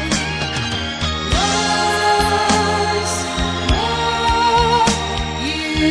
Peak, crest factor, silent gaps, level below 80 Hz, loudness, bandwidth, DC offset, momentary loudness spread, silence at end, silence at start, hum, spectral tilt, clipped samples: -2 dBFS; 16 dB; none; -28 dBFS; -17 LUFS; 11 kHz; under 0.1%; 6 LU; 0 s; 0 s; none; -3.5 dB/octave; under 0.1%